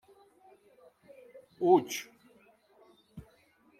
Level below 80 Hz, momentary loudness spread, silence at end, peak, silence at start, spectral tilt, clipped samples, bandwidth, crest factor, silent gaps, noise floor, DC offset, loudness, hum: -72 dBFS; 28 LU; 0.6 s; -10 dBFS; 1.35 s; -5 dB/octave; under 0.1%; 16 kHz; 24 dB; none; -65 dBFS; under 0.1%; -29 LUFS; none